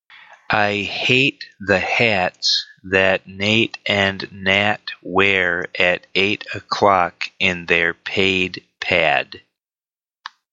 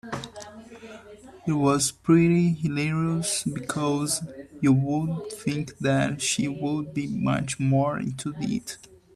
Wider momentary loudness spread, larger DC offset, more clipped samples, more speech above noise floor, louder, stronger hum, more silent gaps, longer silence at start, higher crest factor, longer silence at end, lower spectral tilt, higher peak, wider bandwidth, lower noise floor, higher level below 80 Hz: second, 7 LU vs 18 LU; neither; neither; first, over 71 dB vs 22 dB; first, -18 LUFS vs -25 LUFS; neither; neither; first, 0.5 s vs 0.05 s; about the same, 20 dB vs 18 dB; first, 1.15 s vs 0.4 s; about the same, -4 dB/octave vs -5 dB/octave; first, 0 dBFS vs -8 dBFS; second, 8 kHz vs 13.5 kHz; first, under -90 dBFS vs -47 dBFS; about the same, -56 dBFS vs -58 dBFS